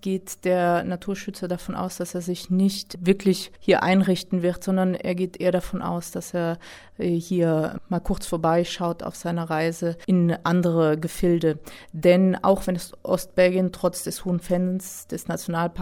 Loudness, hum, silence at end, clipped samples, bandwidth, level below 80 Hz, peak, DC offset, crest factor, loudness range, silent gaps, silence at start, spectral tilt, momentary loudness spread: -24 LUFS; none; 0 s; under 0.1%; 16.5 kHz; -46 dBFS; -6 dBFS; under 0.1%; 18 dB; 4 LU; none; 0.05 s; -6 dB/octave; 10 LU